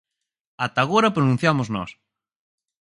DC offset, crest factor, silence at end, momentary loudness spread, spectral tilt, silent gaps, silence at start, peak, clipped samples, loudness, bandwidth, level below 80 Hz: under 0.1%; 20 dB; 1.05 s; 11 LU; -6 dB/octave; none; 0.6 s; -4 dBFS; under 0.1%; -21 LUFS; 11.5 kHz; -58 dBFS